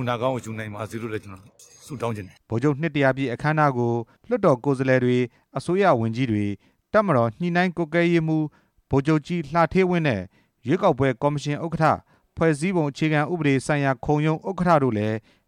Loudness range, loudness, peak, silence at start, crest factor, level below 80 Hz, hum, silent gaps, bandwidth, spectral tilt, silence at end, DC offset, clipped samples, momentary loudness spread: 3 LU; -23 LUFS; -6 dBFS; 0 s; 16 dB; -52 dBFS; none; none; 11.5 kHz; -7 dB/octave; 0.3 s; under 0.1%; under 0.1%; 11 LU